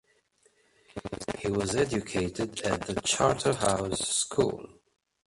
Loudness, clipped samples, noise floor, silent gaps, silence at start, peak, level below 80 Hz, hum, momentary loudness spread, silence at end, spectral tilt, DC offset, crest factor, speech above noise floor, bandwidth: -29 LUFS; under 0.1%; -67 dBFS; none; 0.95 s; -10 dBFS; -52 dBFS; none; 12 LU; 0.6 s; -3.5 dB/octave; under 0.1%; 20 dB; 39 dB; 11.5 kHz